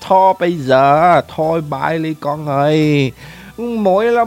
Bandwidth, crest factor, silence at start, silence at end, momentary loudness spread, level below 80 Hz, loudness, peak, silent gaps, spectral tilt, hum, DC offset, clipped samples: 16.5 kHz; 14 dB; 0 s; 0 s; 10 LU; -50 dBFS; -14 LUFS; 0 dBFS; none; -7 dB/octave; none; under 0.1%; under 0.1%